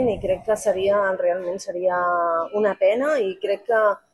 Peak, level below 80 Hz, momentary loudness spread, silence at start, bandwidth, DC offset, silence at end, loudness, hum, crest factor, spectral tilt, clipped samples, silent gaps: -6 dBFS; -52 dBFS; 5 LU; 0 s; 12.5 kHz; under 0.1%; 0.15 s; -22 LUFS; none; 14 dB; -4.5 dB/octave; under 0.1%; none